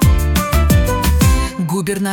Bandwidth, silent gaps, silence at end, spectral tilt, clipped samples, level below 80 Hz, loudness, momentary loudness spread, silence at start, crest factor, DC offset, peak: 18.5 kHz; none; 0 s; -5.5 dB/octave; under 0.1%; -18 dBFS; -15 LUFS; 6 LU; 0 s; 12 dB; under 0.1%; -2 dBFS